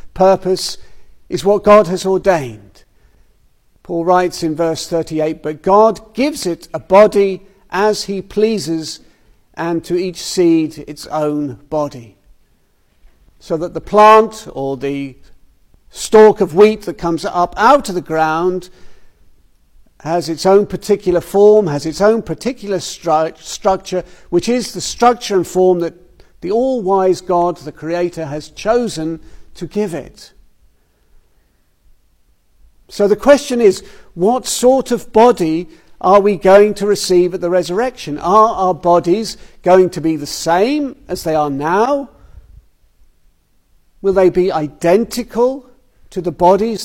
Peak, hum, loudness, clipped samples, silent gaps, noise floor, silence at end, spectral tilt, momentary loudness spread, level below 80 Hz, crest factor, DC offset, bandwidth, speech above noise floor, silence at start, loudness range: 0 dBFS; none; -14 LUFS; under 0.1%; none; -56 dBFS; 0 s; -5 dB/octave; 14 LU; -44 dBFS; 14 dB; under 0.1%; 16.5 kHz; 42 dB; 0.05 s; 7 LU